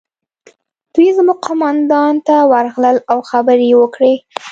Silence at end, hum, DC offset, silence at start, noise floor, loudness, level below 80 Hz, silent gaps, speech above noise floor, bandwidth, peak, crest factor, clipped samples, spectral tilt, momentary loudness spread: 0 s; none; under 0.1%; 0.95 s; -49 dBFS; -12 LUFS; -62 dBFS; none; 37 dB; 7.8 kHz; 0 dBFS; 12 dB; under 0.1%; -5 dB/octave; 5 LU